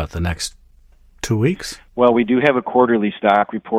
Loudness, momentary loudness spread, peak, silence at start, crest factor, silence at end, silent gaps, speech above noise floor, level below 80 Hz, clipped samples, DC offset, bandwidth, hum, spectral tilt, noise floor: -17 LUFS; 12 LU; 0 dBFS; 0 s; 16 dB; 0 s; none; 32 dB; -40 dBFS; under 0.1%; under 0.1%; 15 kHz; none; -5.5 dB/octave; -49 dBFS